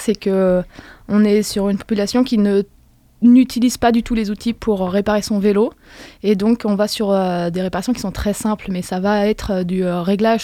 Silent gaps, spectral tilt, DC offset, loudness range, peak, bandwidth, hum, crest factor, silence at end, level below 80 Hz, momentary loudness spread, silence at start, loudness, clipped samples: none; -6 dB/octave; under 0.1%; 3 LU; -2 dBFS; 15.5 kHz; none; 14 dB; 0 s; -40 dBFS; 7 LU; 0 s; -17 LUFS; under 0.1%